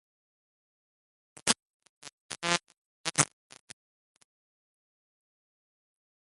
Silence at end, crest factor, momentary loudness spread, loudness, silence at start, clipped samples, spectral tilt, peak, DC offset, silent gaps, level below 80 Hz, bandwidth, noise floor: 3.15 s; 38 dB; 23 LU; -30 LUFS; 1.45 s; under 0.1%; -1.5 dB/octave; 0 dBFS; under 0.1%; 1.62-1.80 s, 1.89-2.02 s, 2.13-2.29 s, 2.78-3.04 s; -70 dBFS; 11.5 kHz; under -90 dBFS